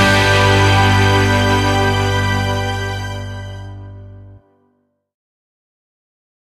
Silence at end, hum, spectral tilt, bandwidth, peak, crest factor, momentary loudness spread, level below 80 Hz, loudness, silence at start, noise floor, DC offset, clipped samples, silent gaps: 2.05 s; 50 Hz at -40 dBFS; -5 dB/octave; 13.5 kHz; 0 dBFS; 16 dB; 19 LU; -32 dBFS; -14 LUFS; 0 s; -63 dBFS; under 0.1%; under 0.1%; none